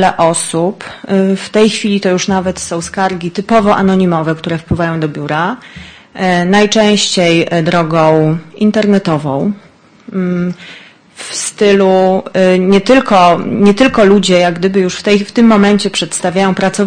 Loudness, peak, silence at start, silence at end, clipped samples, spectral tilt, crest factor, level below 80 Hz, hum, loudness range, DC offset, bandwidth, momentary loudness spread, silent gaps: -11 LUFS; 0 dBFS; 0 s; 0 s; 0.2%; -5 dB/octave; 10 dB; -42 dBFS; none; 5 LU; under 0.1%; 9.8 kHz; 10 LU; none